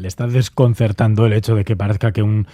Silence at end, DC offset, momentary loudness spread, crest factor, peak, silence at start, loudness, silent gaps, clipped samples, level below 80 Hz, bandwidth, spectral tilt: 0.1 s; under 0.1%; 3 LU; 16 dB; 0 dBFS; 0 s; -16 LUFS; none; under 0.1%; -44 dBFS; 13.5 kHz; -7.5 dB/octave